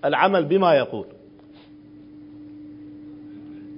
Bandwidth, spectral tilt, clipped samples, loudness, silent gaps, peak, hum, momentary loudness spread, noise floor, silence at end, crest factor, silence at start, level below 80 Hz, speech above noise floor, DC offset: 5.4 kHz; -10.5 dB/octave; under 0.1%; -20 LUFS; none; -2 dBFS; none; 24 LU; -47 dBFS; 0 s; 22 dB; 0.05 s; -66 dBFS; 28 dB; under 0.1%